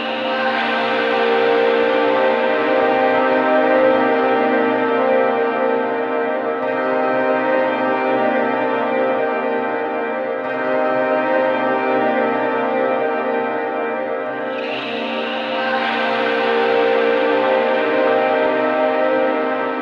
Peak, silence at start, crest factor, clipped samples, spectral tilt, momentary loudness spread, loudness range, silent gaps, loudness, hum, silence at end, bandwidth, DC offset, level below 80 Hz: -4 dBFS; 0 s; 14 dB; under 0.1%; -6 dB/octave; 6 LU; 4 LU; none; -17 LUFS; none; 0 s; 6.6 kHz; under 0.1%; -66 dBFS